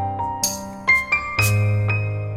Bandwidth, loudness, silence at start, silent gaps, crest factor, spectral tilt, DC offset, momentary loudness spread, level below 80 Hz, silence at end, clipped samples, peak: 16.5 kHz; -20 LUFS; 0 s; none; 18 dB; -3.5 dB/octave; under 0.1%; 7 LU; -42 dBFS; 0 s; under 0.1%; -4 dBFS